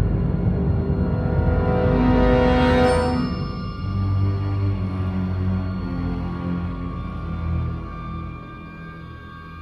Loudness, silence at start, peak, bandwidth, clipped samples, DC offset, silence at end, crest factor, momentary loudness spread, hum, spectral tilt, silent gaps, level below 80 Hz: -22 LUFS; 0 s; -6 dBFS; 9.2 kHz; under 0.1%; under 0.1%; 0 s; 16 dB; 19 LU; none; -8.5 dB/octave; none; -28 dBFS